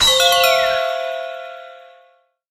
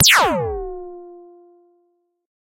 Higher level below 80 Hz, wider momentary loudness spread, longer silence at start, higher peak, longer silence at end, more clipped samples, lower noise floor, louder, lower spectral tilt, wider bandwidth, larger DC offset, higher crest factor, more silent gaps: about the same, -46 dBFS vs -44 dBFS; second, 21 LU vs 26 LU; about the same, 0 s vs 0 s; about the same, -2 dBFS vs -2 dBFS; second, 0.7 s vs 1.4 s; neither; second, -56 dBFS vs -66 dBFS; about the same, -15 LUFS vs -17 LUFS; second, 0.5 dB/octave vs -1.5 dB/octave; about the same, 17.5 kHz vs 16.5 kHz; neither; about the same, 18 dB vs 20 dB; neither